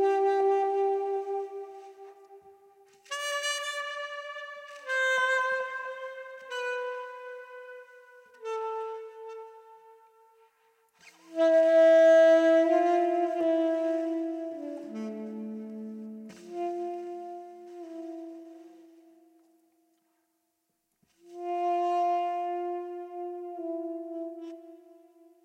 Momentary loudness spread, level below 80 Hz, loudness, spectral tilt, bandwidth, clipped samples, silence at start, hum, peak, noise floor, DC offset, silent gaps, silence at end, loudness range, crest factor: 22 LU; under -90 dBFS; -28 LUFS; -3 dB/octave; 13.5 kHz; under 0.1%; 0 s; none; -12 dBFS; -78 dBFS; under 0.1%; none; 0.7 s; 18 LU; 16 dB